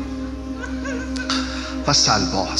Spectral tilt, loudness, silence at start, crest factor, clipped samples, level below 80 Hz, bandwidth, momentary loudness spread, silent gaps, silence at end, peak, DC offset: -3 dB/octave; -21 LUFS; 0 s; 20 dB; under 0.1%; -34 dBFS; 11 kHz; 14 LU; none; 0 s; -2 dBFS; under 0.1%